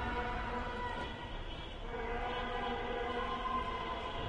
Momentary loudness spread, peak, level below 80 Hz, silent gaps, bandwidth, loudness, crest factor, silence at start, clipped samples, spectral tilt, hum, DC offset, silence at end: 7 LU; -24 dBFS; -46 dBFS; none; 10.5 kHz; -39 LUFS; 14 dB; 0 s; under 0.1%; -5.5 dB/octave; none; under 0.1%; 0 s